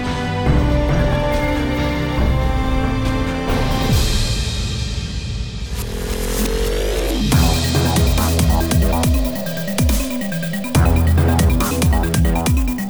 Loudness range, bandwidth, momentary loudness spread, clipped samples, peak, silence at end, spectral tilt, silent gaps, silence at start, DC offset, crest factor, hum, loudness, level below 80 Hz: 4 LU; over 20 kHz; 8 LU; under 0.1%; -4 dBFS; 0 s; -5.5 dB/octave; none; 0 s; under 0.1%; 12 dB; none; -18 LUFS; -20 dBFS